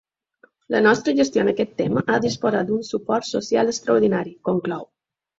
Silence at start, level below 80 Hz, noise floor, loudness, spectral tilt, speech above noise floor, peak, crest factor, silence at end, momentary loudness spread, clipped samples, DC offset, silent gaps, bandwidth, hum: 0.7 s; -60 dBFS; -58 dBFS; -21 LUFS; -5 dB/octave; 38 dB; -2 dBFS; 18 dB; 0.55 s; 7 LU; under 0.1%; under 0.1%; none; 8 kHz; none